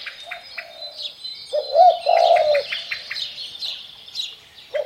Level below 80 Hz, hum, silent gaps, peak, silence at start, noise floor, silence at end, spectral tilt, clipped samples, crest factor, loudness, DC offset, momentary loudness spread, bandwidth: -68 dBFS; none; none; -4 dBFS; 0 s; -39 dBFS; 0 s; -0.5 dB/octave; under 0.1%; 18 dB; -20 LUFS; under 0.1%; 18 LU; 13.5 kHz